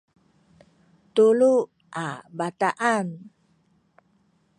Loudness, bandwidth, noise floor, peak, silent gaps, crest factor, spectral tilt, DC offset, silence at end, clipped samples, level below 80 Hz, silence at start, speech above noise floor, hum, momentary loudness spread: -23 LUFS; 11 kHz; -65 dBFS; -8 dBFS; none; 18 dB; -5.5 dB/octave; under 0.1%; 1.3 s; under 0.1%; -76 dBFS; 1.15 s; 43 dB; none; 16 LU